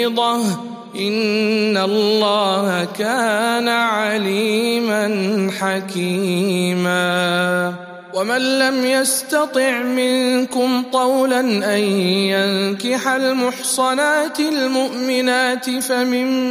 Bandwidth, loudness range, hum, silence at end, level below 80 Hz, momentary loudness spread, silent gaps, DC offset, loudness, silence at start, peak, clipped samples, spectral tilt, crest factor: 15.5 kHz; 1 LU; none; 0 s; -72 dBFS; 4 LU; none; under 0.1%; -17 LUFS; 0 s; -2 dBFS; under 0.1%; -4 dB/octave; 16 dB